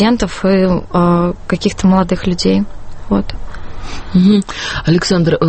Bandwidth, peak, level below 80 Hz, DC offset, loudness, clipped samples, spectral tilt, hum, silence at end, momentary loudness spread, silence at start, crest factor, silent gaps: 8.8 kHz; 0 dBFS; -28 dBFS; under 0.1%; -14 LUFS; under 0.1%; -6.5 dB/octave; none; 0 s; 15 LU; 0 s; 12 dB; none